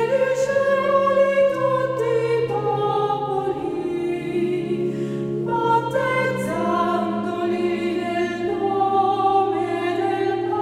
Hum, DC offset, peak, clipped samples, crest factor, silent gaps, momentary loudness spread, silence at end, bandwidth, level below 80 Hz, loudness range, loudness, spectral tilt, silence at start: none; under 0.1%; -6 dBFS; under 0.1%; 14 dB; none; 6 LU; 0 s; 14 kHz; -58 dBFS; 3 LU; -21 LUFS; -6.5 dB/octave; 0 s